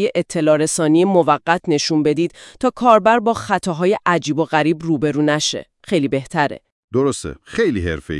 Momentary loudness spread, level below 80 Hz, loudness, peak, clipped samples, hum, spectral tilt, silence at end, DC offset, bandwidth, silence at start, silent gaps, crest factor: 8 LU; -48 dBFS; -17 LUFS; 0 dBFS; under 0.1%; none; -5 dB/octave; 0 s; under 0.1%; 12 kHz; 0 s; 6.72-6.88 s; 18 dB